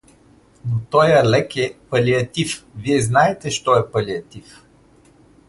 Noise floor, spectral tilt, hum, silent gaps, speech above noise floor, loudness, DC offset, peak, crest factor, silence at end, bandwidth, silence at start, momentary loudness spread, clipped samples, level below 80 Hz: -51 dBFS; -5 dB/octave; none; none; 33 dB; -18 LUFS; under 0.1%; -2 dBFS; 18 dB; 1.1 s; 11.5 kHz; 0.65 s; 12 LU; under 0.1%; -50 dBFS